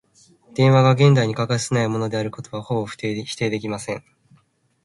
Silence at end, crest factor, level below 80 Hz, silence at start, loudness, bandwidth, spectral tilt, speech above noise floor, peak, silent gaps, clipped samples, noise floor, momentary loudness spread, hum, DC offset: 0.85 s; 18 dB; -58 dBFS; 0.55 s; -20 LUFS; 11.5 kHz; -6 dB/octave; 41 dB; -2 dBFS; none; under 0.1%; -60 dBFS; 15 LU; none; under 0.1%